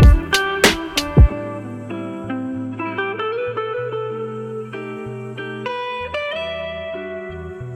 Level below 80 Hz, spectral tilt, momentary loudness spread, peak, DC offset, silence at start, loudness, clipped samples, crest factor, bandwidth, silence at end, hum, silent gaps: -24 dBFS; -5 dB/octave; 15 LU; -2 dBFS; under 0.1%; 0 s; -22 LUFS; under 0.1%; 18 dB; 17 kHz; 0 s; none; none